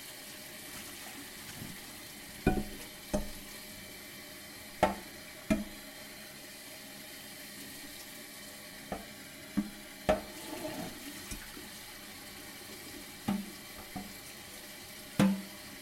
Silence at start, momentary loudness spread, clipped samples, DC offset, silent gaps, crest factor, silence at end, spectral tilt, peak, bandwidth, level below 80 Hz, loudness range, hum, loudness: 0 s; 13 LU; under 0.1%; under 0.1%; none; 28 dB; 0 s; -4.5 dB/octave; -12 dBFS; 16.5 kHz; -52 dBFS; 5 LU; none; -40 LUFS